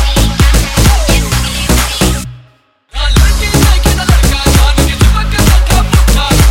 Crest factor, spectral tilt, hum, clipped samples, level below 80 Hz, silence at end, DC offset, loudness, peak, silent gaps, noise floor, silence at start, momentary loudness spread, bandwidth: 8 dB; -4 dB/octave; none; under 0.1%; -10 dBFS; 0 s; under 0.1%; -10 LUFS; 0 dBFS; none; -46 dBFS; 0 s; 4 LU; 17 kHz